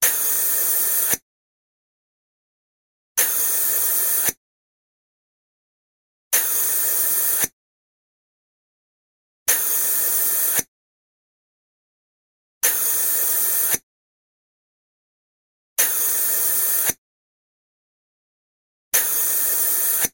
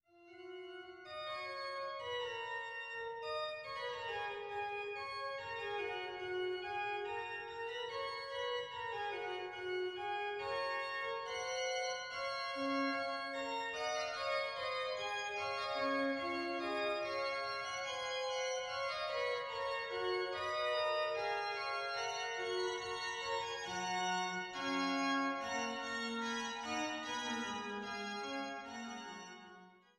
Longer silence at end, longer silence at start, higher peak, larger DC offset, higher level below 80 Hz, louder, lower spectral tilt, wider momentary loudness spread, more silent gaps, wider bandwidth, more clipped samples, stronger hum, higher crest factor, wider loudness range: second, 0.05 s vs 0.2 s; second, 0 s vs 0.15 s; first, -4 dBFS vs -26 dBFS; neither; first, -64 dBFS vs -76 dBFS; first, -18 LUFS vs -40 LUFS; second, 1 dB/octave vs -2.5 dB/octave; second, 4 LU vs 7 LU; first, 1.22-3.15 s, 4.37-6.31 s, 7.53-9.46 s, 10.68-12.61 s, 13.83-15.76 s, 16.98-18.92 s vs none; first, 17 kHz vs 13.5 kHz; neither; neither; about the same, 20 dB vs 16 dB; second, 1 LU vs 4 LU